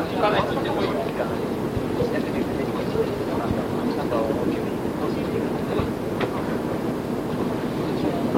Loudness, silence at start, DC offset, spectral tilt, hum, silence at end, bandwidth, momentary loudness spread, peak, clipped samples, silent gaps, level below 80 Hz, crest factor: -25 LUFS; 0 s; under 0.1%; -7 dB/octave; none; 0 s; 16.5 kHz; 3 LU; -8 dBFS; under 0.1%; none; -44 dBFS; 16 dB